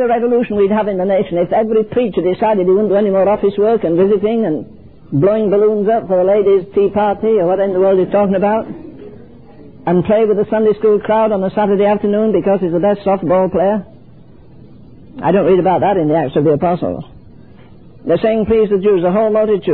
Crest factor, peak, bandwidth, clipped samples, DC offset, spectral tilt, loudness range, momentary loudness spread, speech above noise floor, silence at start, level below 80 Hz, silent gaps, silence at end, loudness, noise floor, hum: 12 dB; -2 dBFS; 4.3 kHz; under 0.1%; 0.7%; -12 dB/octave; 2 LU; 4 LU; 28 dB; 0 s; -46 dBFS; none; 0 s; -14 LUFS; -41 dBFS; none